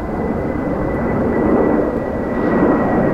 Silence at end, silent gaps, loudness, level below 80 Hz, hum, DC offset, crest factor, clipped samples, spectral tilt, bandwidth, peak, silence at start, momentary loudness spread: 0 s; none; -17 LUFS; -32 dBFS; none; under 0.1%; 14 dB; under 0.1%; -9.5 dB/octave; 8 kHz; -2 dBFS; 0 s; 6 LU